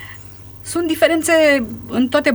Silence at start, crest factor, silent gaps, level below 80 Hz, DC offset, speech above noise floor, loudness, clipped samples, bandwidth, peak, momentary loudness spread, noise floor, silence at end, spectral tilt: 0 s; 16 dB; none; -48 dBFS; under 0.1%; 21 dB; -16 LUFS; under 0.1%; over 20 kHz; -2 dBFS; 21 LU; -37 dBFS; 0 s; -3.5 dB/octave